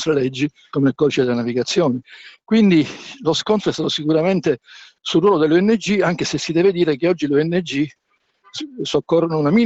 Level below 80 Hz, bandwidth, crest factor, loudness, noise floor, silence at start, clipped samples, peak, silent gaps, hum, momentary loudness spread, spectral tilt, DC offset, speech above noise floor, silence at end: -56 dBFS; 8.2 kHz; 12 dB; -18 LUFS; -57 dBFS; 0 s; under 0.1%; -6 dBFS; none; none; 10 LU; -5.5 dB/octave; under 0.1%; 39 dB; 0 s